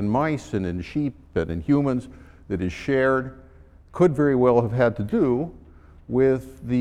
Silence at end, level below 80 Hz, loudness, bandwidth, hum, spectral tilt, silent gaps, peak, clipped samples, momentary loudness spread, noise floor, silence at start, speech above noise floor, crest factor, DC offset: 0 s; -46 dBFS; -23 LUFS; 10.5 kHz; none; -8.5 dB/octave; none; -6 dBFS; under 0.1%; 9 LU; -49 dBFS; 0 s; 27 dB; 18 dB; under 0.1%